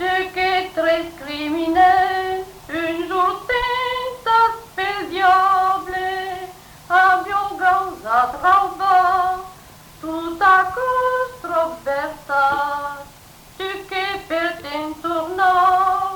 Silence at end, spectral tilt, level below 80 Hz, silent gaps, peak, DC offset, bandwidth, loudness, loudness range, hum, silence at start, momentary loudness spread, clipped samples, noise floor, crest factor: 0 s; -3.5 dB/octave; -48 dBFS; none; -4 dBFS; under 0.1%; 19 kHz; -19 LUFS; 5 LU; none; 0 s; 13 LU; under 0.1%; -44 dBFS; 16 dB